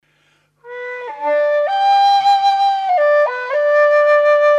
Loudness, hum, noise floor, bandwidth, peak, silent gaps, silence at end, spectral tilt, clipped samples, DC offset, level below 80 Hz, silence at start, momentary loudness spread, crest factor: -14 LUFS; 50 Hz at -65 dBFS; -59 dBFS; 8 kHz; -6 dBFS; none; 0 s; -0.5 dB/octave; under 0.1%; under 0.1%; -78 dBFS; 0.65 s; 15 LU; 8 dB